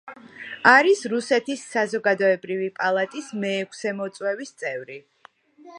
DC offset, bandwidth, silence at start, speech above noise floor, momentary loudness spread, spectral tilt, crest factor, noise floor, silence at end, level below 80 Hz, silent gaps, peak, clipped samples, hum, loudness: under 0.1%; 11 kHz; 0.05 s; 31 dB; 19 LU; -4 dB/octave; 24 dB; -54 dBFS; 0 s; -78 dBFS; none; 0 dBFS; under 0.1%; none; -22 LUFS